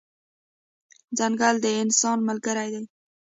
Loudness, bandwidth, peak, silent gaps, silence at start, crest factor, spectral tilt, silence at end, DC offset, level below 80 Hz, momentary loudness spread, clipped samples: -24 LUFS; 8 kHz; -8 dBFS; none; 1.1 s; 18 dB; -2.5 dB/octave; 0.4 s; under 0.1%; -74 dBFS; 12 LU; under 0.1%